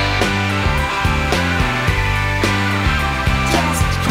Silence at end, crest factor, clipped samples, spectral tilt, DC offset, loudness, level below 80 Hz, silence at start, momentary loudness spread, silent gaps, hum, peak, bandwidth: 0 s; 12 dB; under 0.1%; -4.5 dB/octave; under 0.1%; -17 LUFS; -24 dBFS; 0 s; 1 LU; none; none; -4 dBFS; 16 kHz